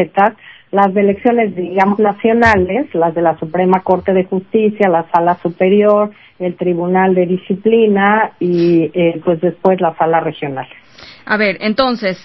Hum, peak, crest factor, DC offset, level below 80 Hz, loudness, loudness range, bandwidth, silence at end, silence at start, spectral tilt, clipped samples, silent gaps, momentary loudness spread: none; 0 dBFS; 14 dB; 0.2%; -44 dBFS; -14 LUFS; 2 LU; 8 kHz; 0.05 s; 0 s; -8 dB/octave; under 0.1%; none; 7 LU